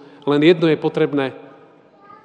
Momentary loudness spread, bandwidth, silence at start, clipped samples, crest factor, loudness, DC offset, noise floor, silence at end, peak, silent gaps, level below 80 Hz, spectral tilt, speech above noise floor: 9 LU; 9.2 kHz; 0.25 s; under 0.1%; 18 dB; -17 LUFS; under 0.1%; -48 dBFS; 0.85 s; 0 dBFS; none; -76 dBFS; -7.5 dB/octave; 32 dB